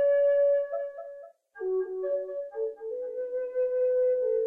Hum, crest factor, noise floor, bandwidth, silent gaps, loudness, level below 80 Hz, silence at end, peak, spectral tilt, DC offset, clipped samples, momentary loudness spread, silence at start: none; 10 dB; -47 dBFS; 3 kHz; none; -29 LUFS; -74 dBFS; 0 s; -18 dBFS; -6 dB/octave; under 0.1%; under 0.1%; 14 LU; 0 s